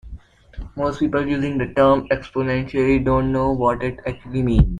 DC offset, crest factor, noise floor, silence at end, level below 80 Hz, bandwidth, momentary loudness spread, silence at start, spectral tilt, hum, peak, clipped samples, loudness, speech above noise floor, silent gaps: under 0.1%; 16 dB; -40 dBFS; 0 s; -30 dBFS; 9.8 kHz; 10 LU; 0.05 s; -8.5 dB/octave; none; -2 dBFS; under 0.1%; -20 LUFS; 21 dB; none